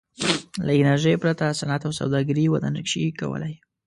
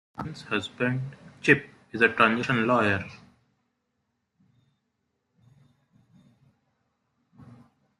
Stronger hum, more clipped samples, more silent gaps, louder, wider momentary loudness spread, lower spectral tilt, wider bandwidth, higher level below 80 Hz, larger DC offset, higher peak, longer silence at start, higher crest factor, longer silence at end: neither; neither; neither; about the same, -23 LUFS vs -24 LUFS; second, 9 LU vs 17 LU; about the same, -5.5 dB/octave vs -6 dB/octave; about the same, 11.5 kHz vs 11 kHz; first, -56 dBFS vs -66 dBFS; neither; about the same, -6 dBFS vs -6 dBFS; about the same, 0.2 s vs 0.2 s; second, 16 dB vs 24 dB; second, 0.3 s vs 0.55 s